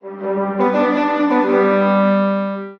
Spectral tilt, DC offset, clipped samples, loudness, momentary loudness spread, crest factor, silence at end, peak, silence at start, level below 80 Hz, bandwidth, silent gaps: -8.5 dB/octave; under 0.1%; under 0.1%; -16 LUFS; 7 LU; 12 dB; 0.05 s; -4 dBFS; 0.05 s; -62 dBFS; 6.2 kHz; none